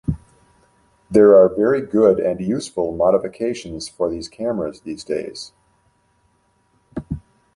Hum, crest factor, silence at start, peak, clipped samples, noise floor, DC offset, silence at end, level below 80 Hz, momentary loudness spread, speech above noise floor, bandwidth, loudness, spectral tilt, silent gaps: none; 18 dB; 0.1 s; -2 dBFS; under 0.1%; -62 dBFS; under 0.1%; 0.35 s; -46 dBFS; 20 LU; 45 dB; 11.5 kHz; -18 LUFS; -6.5 dB/octave; none